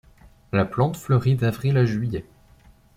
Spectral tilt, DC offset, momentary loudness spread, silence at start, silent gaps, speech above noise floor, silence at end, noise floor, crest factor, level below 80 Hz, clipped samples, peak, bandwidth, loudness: -8 dB/octave; under 0.1%; 7 LU; 0.55 s; none; 32 dB; 0.75 s; -53 dBFS; 16 dB; -50 dBFS; under 0.1%; -6 dBFS; 15.5 kHz; -23 LUFS